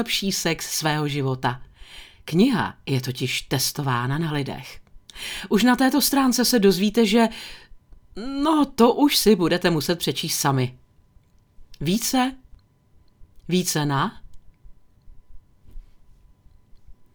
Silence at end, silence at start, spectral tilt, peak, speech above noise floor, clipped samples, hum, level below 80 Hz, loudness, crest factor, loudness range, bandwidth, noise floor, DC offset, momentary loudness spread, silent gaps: 0.2 s; 0 s; -4.5 dB/octave; -2 dBFS; 35 dB; under 0.1%; none; -48 dBFS; -21 LUFS; 20 dB; 9 LU; over 20 kHz; -56 dBFS; under 0.1%; 14 LU; none